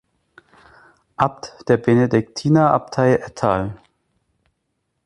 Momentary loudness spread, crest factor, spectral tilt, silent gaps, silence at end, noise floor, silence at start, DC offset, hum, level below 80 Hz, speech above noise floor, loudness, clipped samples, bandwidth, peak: 9 LU; 18 dB; -7.5 dB/octave; none; 1.3 s; -73 dBFS; 1.2 s; under 0.1%; none; -50 dBFS; 55 dB; -18 LUFS; under 0.1%; 11.5 kHz; -2 dBFS